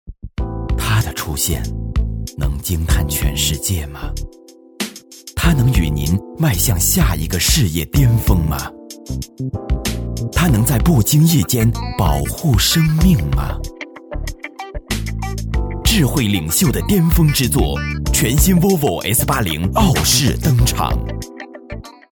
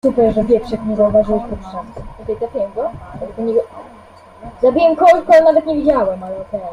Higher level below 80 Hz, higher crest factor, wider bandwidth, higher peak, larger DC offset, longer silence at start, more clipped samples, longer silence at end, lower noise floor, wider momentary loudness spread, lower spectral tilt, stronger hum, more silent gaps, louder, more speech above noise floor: first, -24 dBFS vs -38 dBFS; about the same, 16 dB vs 14 dB; first, over 20 kHz vs 10 kHz; about the same, 0 dBFS vs 0 dBFS; neither; about the same, 0.05 s vs 0.05 s; neither; first, 0.25 s vs 0 s; second, -37 dBFS vs -41 dBFS; second, 16 LU vs 19 LU; second, -4.5 dB/octave vs -7 dB/octave; neither; neither; about the same, -16 LUFS vs -15 LUFS; second, 22 dB vs 26 dB